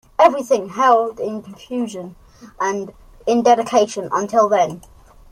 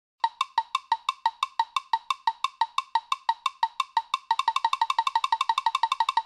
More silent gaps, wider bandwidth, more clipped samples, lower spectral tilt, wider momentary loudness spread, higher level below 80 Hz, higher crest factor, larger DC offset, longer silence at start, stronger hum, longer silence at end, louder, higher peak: neither; first, 15 kHz vs 12.5 kHz; neither; first, -4.5 dB/octave vs 3 dB/octave; first, 15 LU vs 4 LU; first, -52 dBFS vs -80 dBFS; about the same, 18 dB vs 18 dB; neither; about the same, 0.2 s vs 0.25 s; neither; first, 0.5 s vs 0 s; first, -18 LUFS vs -27 LUFS; first, 0 dBFS vs -8 dBFS